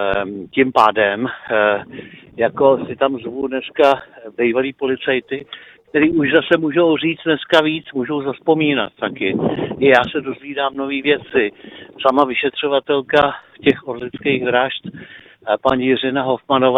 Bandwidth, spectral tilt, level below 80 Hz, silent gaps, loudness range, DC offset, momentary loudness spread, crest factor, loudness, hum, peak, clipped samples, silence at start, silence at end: 8.8 kHz; -6.5 dB/octave; -52 dBFS; none; 2 LU; under 0.1%; 10 LU; 18 dB; -17 LUFS; none; 0 dBFS; under 0.1%; 0 s; 0 s